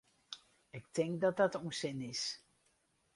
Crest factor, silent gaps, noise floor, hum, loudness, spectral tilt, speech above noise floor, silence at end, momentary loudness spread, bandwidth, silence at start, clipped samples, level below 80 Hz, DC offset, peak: 22 dB; none; -76 dBFS; none; -37 LUFS; -4.5 dB/octave; 40 dB; 0.8 s; 18 LU; 11.5 kHz; 0.3 s; under 0.1%; -78 dBFS; under 0.1%; -18 dBFS